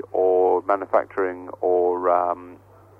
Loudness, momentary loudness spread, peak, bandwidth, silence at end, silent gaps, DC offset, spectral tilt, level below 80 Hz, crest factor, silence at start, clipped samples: -22 LUFS; 8 LU; -6 dBFS; 3.3 kHz; 0.45 s; none; under 0.1%; -8.5 dB/octave; -66 dBFS; 16 dB; 0.15 s; under 0.1%